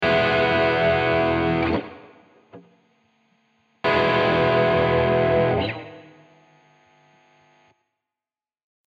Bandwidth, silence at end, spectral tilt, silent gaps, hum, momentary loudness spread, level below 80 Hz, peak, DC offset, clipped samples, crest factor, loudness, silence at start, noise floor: 7.4 kHz; 2.9 s; -7.5 dB/octave; none; none; 9 LU; -46 dBFS; -8 dBFS; under 0.1%; under 0.1%; 14 dB; -20 LUFS; 0 s; under -90 dBFS